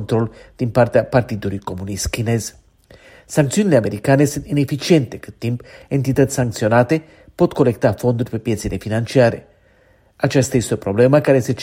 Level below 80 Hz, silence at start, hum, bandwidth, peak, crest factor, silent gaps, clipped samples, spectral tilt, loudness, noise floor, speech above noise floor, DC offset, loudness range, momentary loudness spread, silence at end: -42 dBFS; 0 s; none; 16.5 kHz; 0 dBFS; 18 dB; none; under 0.1%; -6 dB/octave; -18 LUFS; -54 dBFS; 37 dB; under 0.1%; 2 LU; 10 LU; 0 s